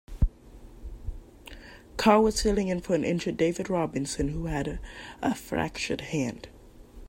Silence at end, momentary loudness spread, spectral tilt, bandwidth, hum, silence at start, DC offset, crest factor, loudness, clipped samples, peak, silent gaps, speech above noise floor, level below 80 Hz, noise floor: 0 s; 24 LU; -5.5 dB/octave; 16 kHz; none; 0.1 s; under 0.1%; 20 dB; -28 LUFS; under 0.1%; -8 dBFS; none; 21 dB; -38 dBFS; -48 dBFS